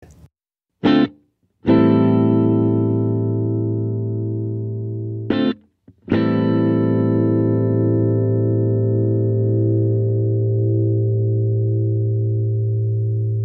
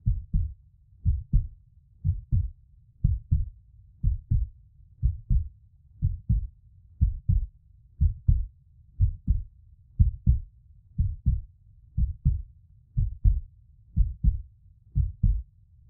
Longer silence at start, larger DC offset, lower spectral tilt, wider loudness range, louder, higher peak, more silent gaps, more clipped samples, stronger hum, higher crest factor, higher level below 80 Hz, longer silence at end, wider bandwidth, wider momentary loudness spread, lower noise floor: first, 0.85 s vs 0.05 s; neither; second, -11 dB/octave vs -18 dB/octave; about the same, 4 LU vs 2 LU; first, -19 LUFS vs -30 LUFS; about the same, -4 dBFS vs -6 dBFS; neither; neither; neither; second, 14 dB vs 22 dB; second, -54 dBFS vs -30 dBFS; second, 0 s vs 0.45 s; first, 4.5 kHz vs 0.5 kHz; second, 7 LU vs 12 LU; first, -81 dBFS vs -56 dBFS